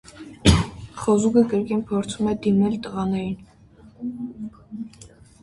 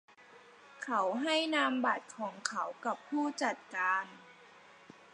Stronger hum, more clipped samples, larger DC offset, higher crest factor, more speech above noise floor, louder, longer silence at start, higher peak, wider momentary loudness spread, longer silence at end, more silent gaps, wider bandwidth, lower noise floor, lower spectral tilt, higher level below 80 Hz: neither; neither; neither; about the same, 22 dB vs 24 dB; about the same, 27 dB vs 24 dB; first, -22 LUFS vs -34 LUFS; about the same, 0.15 s vs 0.2 s; first, -2 dBFS vs -12 dBFS; first, 18 LU vs 10 LU; about the same, 0.35 s vs 0.4 s; neither; about the same, 11.5 kHz vs 11 kHz; second, -50 dBFS vs -58 dBFS; first, -6 dB/octave vs -2.5 dB/octave; first, -36 dBFS vs under -90 dBFS